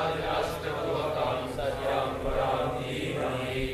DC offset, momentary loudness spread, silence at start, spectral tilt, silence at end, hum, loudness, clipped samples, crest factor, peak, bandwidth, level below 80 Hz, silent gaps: under 0.1%; 3 LU; 0 s; -5.5 dB/octave; 0 s; none; -30 LUFS; under 0.1%; 16 dB; -14 dBFS; 14.5 kHz; -44 dBFS; none